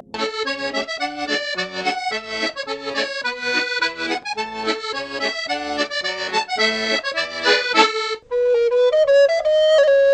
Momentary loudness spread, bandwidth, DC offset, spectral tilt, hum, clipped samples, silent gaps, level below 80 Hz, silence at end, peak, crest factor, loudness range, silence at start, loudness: 10 LU; 9.4 kHz; under 0.1%; -2 dB/octave; none; under 0.1%; none; -60 dBFS; 0 s; -2 dBFS; 18 dB; 6 LU; 0.15 s; -20 LUFS